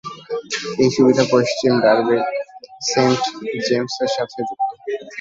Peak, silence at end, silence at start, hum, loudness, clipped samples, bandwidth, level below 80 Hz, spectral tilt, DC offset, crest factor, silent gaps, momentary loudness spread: 0 dBFS; 0 s; 0.05 s; none; -19 LUFS; under 0.1%; 8 kHz; -60 dBFS; -4.5 dB/octave; under 0.1%; 18 dB; none; 13 LU